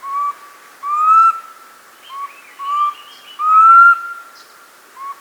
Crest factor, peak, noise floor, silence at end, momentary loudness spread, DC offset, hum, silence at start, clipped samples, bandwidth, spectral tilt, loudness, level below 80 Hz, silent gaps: 16 dB; 0 dBFS; -44 dBFS; 0.05 s; 25 LU; under 0.1%; none; 0.05 s; under 0.1%; over 20 kHz; 1 dB/octave; -11 LUFS; -82 dBFS; none